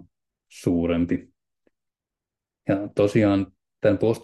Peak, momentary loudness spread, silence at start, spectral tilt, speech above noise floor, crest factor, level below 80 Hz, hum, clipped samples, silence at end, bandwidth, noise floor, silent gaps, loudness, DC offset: -8 dBFS; 10 LU; 0.55 s; -7.5 dB/octave; 67 dB; 18 dB; -56 dBFS; none; under 0.1%; 0.05 s; 12.5 kHz; -88 dBFS; none; -23 LUFS; under 0.1%